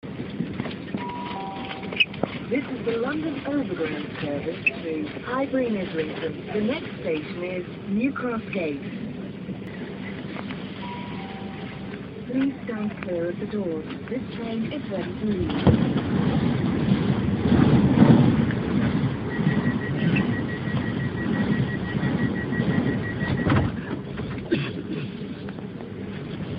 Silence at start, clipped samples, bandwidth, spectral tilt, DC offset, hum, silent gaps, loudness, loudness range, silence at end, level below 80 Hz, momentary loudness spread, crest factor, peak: 0.05 s; under 0.1%; 5.4 kHz; -10.5 dB/octave; under 0.1%; none; none; -26 LUFS; 10 LU; 0 s; -46 dBFS; 12 LU; 22 dB; -4 dBFS